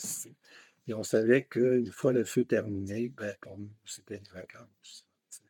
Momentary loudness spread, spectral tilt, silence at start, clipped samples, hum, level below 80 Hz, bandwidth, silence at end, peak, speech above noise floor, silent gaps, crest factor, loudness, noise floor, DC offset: 23 LU; -5.5 dB/octave; 0 s; under 0.1%; none; -82 dBFS; 18 kHz; 0.1 s; -10 dBFS; 28 dB; none; 22 dB; -30 LUFS; -59 dBFS; under 0.1%